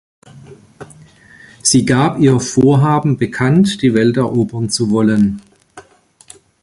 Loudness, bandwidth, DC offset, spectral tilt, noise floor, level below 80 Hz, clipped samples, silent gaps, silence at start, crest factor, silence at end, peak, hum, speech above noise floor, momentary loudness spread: -13 LUFS; 11.5 kHz; under 0.1%; -5.5 dB/octave; -48 dBFS; -46 dBFS; under 0.1%; none; 0.35 s; 14 dB; 0.8 s; 0 dBFS; none; 36 dB; 6 LU